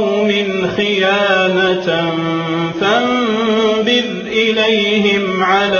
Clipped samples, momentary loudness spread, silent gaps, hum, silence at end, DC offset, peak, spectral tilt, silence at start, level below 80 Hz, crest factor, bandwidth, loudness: under 0.1%; 5 LU; none; none; 0 s; under 0.1%; 0 dBFS; -5 dB/octave; 0 s; -52 dBFS; 14 dB; 7 kHz; -14 LUFS